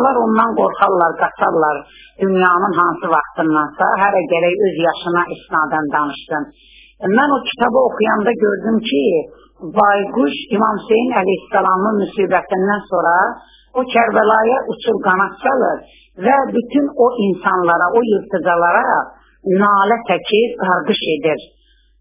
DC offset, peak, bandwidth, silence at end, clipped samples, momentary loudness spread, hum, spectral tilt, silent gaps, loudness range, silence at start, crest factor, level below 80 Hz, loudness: under 0.1%; 0 dBFS; 4 kHz; 0.55 s; under 0.1%; 7 LU; none; -9.5 dB/octave; none; 2 LU; 0 s; 16 dB; -54 dBFS; -15 LUFS